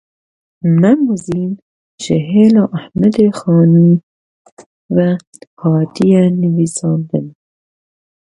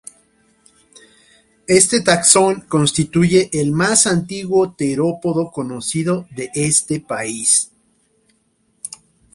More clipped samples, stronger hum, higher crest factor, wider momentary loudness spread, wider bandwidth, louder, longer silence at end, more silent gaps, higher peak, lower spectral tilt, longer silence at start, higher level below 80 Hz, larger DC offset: neither; neither; about the same, 14 dB vs 18 dB; about the same, 11 LU vs 13 LU; about the same, 11.5 kHz vs 12.5 kHz; first, -13 LUFS vs -16 LUFS; first, 1.05 s vs 0.45 s; first, 1.62-1.98 s, 4.03-4.45 s, 4.52-4.57 s, 4.66-4.89 s, 5.27-5.32 s, 5.47-5.57 s vs none; about the same, 0 dBFS vs 0 dBFS; first, -8 dB/octave vs -3.5 dB/octave; second, 0.65 s vs 1.7 s; about the same, -52 dBFS vs -52 dBFS; neither